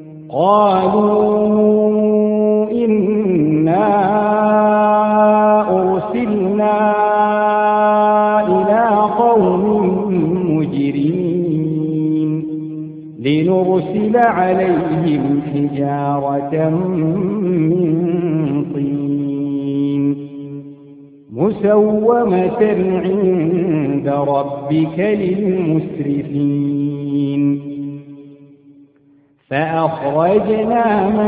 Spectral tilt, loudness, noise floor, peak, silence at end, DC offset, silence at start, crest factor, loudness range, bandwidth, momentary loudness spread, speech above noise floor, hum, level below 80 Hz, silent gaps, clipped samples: -12 dB/octave; -15 LUFS; -52 dBFS; 0 dBFS; 0 s; under 0.1%; 0 s; 14 dB; 6 LU; 4.8 kHz; 7 LU; 38 dB; none; -52 dBFS; none; under 0.1%